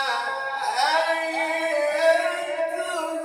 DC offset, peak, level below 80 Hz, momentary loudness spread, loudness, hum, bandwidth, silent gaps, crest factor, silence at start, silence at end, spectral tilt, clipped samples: under 0.1%; -8 dBFS; -78 dBFS; 7 LU; -23 LUFS; none; 16 kHz; none; 16 dB; 0 s; 0 s; -0.5 dB/octave; under 0.1%